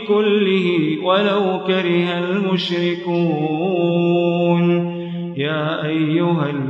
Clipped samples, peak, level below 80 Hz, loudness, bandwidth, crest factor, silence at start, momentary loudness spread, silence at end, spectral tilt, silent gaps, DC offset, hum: under 0.1%; -4 dBFS; -68 dBFS; -18 LUFS; 6.6 kHz; 12 dB; 0 s; 5 LU; 0 s; -8 dB/octave; none; under 0.1%; none